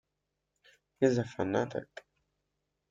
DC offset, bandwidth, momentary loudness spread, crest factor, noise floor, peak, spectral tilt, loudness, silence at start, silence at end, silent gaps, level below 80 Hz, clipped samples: under 0.1%; 7.8 kHz; 20 LU; 22 dB; -85 dBFS; -12 dBFS; -6.5 dB/octave; -32 LUFS; 1 s; 1.05 s; none; -70 dBFS; under 0.1%